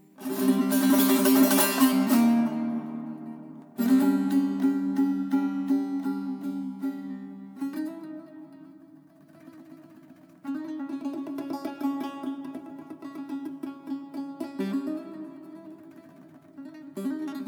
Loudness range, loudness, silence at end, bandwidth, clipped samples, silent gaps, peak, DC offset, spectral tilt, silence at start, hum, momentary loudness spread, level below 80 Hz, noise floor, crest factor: 16 LU; -27 LUFS; 0 s; over 20 kHz; under 0.1%; none; -8 dBFS; under 0.1%; -4.5 dB/octave; 0.2 s; none; 21 LU; -84 dBFS; -53 dBFS; 20 dB